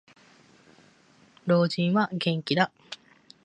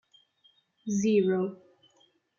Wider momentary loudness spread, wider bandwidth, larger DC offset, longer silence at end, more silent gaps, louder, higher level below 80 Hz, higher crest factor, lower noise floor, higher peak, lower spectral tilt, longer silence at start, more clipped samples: first, 20 LU vs 12 LU; first, 9.6 kHz vs 7.4 kHz; neither; second, 0.5 s vs 0.85 s; neither; about the same, -26 LUFS vs -28 LUFS; about the same, -72 dBFS vs -76 dBFS; about the same, 22 dB vs 18 dB; second, -59 dBFS vs -67 dBFS; first, -6 dBFS vs -14 dBFS; about the same, -6.5 dB/octave vs -6 dB/octave; first, 1.45 s vs 0.85 s; neither